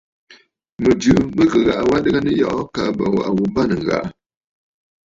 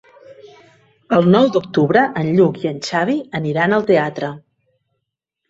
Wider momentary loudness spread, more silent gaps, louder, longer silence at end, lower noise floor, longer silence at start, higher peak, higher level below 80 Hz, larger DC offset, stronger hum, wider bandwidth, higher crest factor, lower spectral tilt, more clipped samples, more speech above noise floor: about the same, 7 LU vs 9 LU; first, 0.72-0.76 s vs none; about the same, -17 LUFS vs -16 LUFS; second, 0.95 s vs 1.1 s; second, -50 dBFS vs -77 dBFS; about the same, 0.3 s vs 0.3 s; about the same, -2 dBFS vs -2 dBFS; first, -42 dBFS vs -58 dBFS; neither; neither; about the same, 7.8 kHz vs 8 kHz; about the same, 16 dB vs 16 dB; about the same, -6.5 dB/octave vs -7 dB/octave; neither; second, 34 dB vs 62 dB